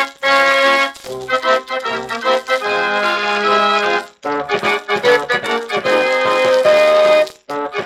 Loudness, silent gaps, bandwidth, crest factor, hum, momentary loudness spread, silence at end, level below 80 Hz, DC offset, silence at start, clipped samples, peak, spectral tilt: -15 LUFS; none; 15 kHz; 14 dB; none; 10 LU; 0 s; -58 dBFS; under 0.1%; 0 s; under 0.1%; -2 dBFS; -2.5 dB/octave